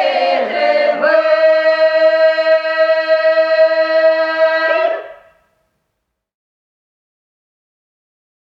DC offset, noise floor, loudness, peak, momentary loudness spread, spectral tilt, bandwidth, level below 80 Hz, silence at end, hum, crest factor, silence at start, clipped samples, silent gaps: under 0.1%; -73 dBFS; -13 LUFS; 0 dBFS; 4 LU; -3 dB/octave; 6 kHz; -72 dBFS; 3.45 s; none; 14 dB; 0 s; under 0.1%; none